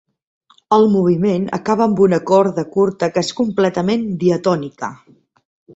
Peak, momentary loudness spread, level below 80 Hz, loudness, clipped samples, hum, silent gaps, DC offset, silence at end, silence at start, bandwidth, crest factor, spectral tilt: -2 dBFS; 6 LU; -56 dBFS; -16 LUFS; under 0.1%; none; none; under 0.1%; 0.8 s; 0.7 s; 8 kHz; 16 dB; -7 dB/octave